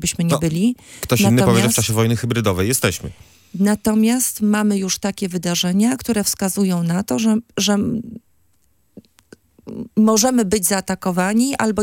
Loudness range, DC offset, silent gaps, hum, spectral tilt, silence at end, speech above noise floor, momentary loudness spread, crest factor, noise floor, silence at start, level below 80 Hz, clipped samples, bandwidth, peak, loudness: 4 LU; under 0.1%; none; none; -4.5 dB/octave; 0 s; 46 dB; 9 LU; 18 dB; -63 dBFS; 0 s; -48 dBFS; under 0.1%; 17 kHz; 0 dBFS; -18 LUFS